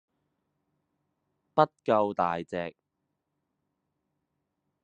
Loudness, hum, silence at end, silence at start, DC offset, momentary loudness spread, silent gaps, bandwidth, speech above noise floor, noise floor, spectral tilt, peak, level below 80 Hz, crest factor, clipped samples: -28 LUFS; none; 2.15 s; 1.55 s; under 0.1%; 11 LU; none; 8.4 kHz; 55 dB; -82 dBFS; -7.5 dB/octave; -6 dBFS; -78 dBFS; 26 dB; under 0.1%